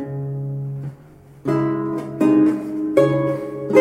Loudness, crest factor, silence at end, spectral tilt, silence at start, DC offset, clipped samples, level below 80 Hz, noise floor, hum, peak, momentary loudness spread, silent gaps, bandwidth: -20 LUFS; 20 dB; 0 s; -8.5 dB/octave; 0 s; under 0.1%; under 0.1%; -56 dBFS; -45 dBFS; none; 0 dBFS; 13 LU; none; 11 kHz